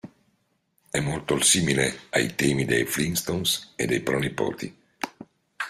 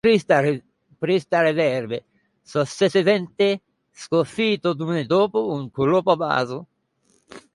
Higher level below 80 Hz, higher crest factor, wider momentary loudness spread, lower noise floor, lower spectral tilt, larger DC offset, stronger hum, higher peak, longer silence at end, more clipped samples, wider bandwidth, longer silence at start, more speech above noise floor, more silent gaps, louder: first, -54 dBFS vs -62 dBFS; about the same, 20 dB vs 18 dB; first, 16 LU vs 11 LU; first, -70 dBFS vs -65 dBFS; second, -3.5 dB/octave vs -6 dB/octave; neither; neither; about the same, -6 dBFS vs -4 dBFS; second, 0 s vs 0.15 s; neither; first, 16 kHz vs 11.5 kHz; about the same, 0.05 s vs 0.05 s; about the same, 45 dB vs 44 dB; neither; second, -24 LUFS vs -21 LUFS